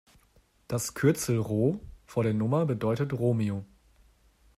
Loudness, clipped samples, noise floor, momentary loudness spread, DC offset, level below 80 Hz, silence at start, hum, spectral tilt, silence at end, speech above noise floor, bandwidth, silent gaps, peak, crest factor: -29 LUFS; under 0.1%; -64 dBFS; 8 LU; under 0.1%; -58 dBFS; 0.7 s; none; -6.5 dB/octave; 0.95 s; 37 dB; 15 kHz; none; -12 dBFS; 18 dB